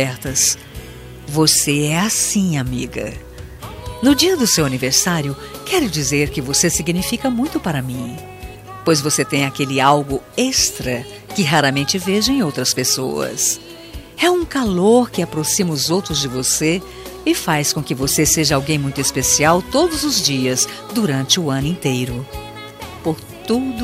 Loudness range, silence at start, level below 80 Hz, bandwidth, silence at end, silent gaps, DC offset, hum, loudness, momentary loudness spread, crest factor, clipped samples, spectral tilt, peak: 3 LU; 0 s; -40 dBFS; 16 kHz; 0 s; none; under 0.1%; none; -17 LUFS; 16 LU; 18 dB; under 0.1%; -3.5 dB/octave; -2 dBFS